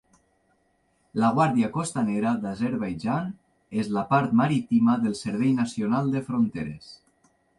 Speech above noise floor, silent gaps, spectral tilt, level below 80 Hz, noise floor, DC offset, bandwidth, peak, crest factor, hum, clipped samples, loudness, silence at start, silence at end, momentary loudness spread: 44 dB; none; -7 dB/octave; -60 dBFS; -68 dBFS; under 0.1%; 11.5 kHz; -8 dBFS; 18 dB; none; under 0.1%; -25 LUFS; 1.15 s; 0.65 s; 11 LU